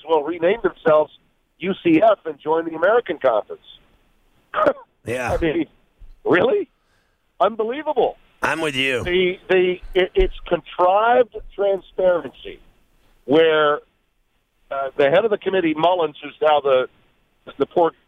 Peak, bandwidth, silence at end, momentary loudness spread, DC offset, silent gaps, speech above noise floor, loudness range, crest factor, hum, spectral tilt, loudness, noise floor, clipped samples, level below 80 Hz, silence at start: -4 dBFS; 12.5 kHz; 0.2 s; 12 LU; under 0.1%; none; 47 dB; 3 LU; 16 dB; none; -5.5 dB/octave; -20 LUFS; -66 dBFS; under 0.1%; -40 dBFS; 0.05 s